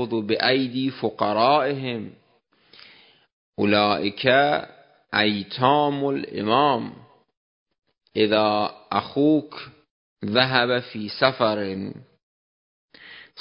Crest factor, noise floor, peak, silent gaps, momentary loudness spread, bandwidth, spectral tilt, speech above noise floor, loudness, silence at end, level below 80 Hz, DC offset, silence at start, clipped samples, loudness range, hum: 24 dB; -63 dBFS; 0 dBFS; 3.33-3.53 s, 7.37-7.66 s, 7.78-7.82 s, 9.91-10.16 s, 12.23-12.88 s; 16 LU; 5.4 kHz; -10 dB/octave; 41 dB; -22 LUFS; 0 s; -62 dBFS; under 0.1%; 0 s; under 0.1%; 3 LU; none